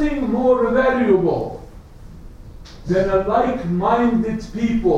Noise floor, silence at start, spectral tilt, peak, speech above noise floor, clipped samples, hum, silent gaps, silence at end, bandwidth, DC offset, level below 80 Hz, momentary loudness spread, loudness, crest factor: -38 dBFS; 0 s; -8 dB/octave; -4 dBFS; 21 dB; under 0.1%; none; none; 0 s; 8.6 kHz; under 0.1%; -36 dBFS; 9 LU; -18 LUFS; 16 dB